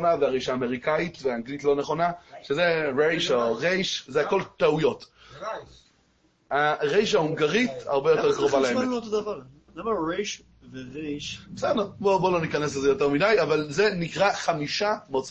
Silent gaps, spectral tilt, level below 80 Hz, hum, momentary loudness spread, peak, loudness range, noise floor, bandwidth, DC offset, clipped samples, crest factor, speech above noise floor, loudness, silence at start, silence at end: none; -4.5 dB/octave; -58 dBFS; none; 13 LU; -8 dBFS; 4 LU; -65 dBFS; 8.4 kHz; under 0.1%; under 0.1%; 16 dB; 40 dB; -25 LUFS; 0 s; 0 s